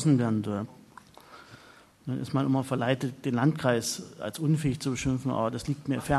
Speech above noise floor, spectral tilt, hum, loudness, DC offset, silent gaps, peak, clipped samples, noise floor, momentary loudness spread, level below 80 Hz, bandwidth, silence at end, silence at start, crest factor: 27 dB; -6 dB/octave; none; -29 LUFS; under 0.1%; none; -10 dBFS; under 0.1%; -55 dBFS; 11 LU; -54 dBFS; 13 kHz; 0 s; 0 s; 20 dB